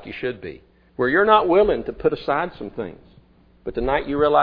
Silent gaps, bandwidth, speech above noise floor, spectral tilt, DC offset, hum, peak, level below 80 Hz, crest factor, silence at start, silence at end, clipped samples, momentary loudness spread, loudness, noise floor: none; 5.2 kHz; 33 dB; -8.5 dB/octave; under 0.1%; none; -2 dBFS; -42 dBFS; 20 dB; 0 s; 0 s; under 0.1%; 19 LU; -20 LUFS; -53 dBFS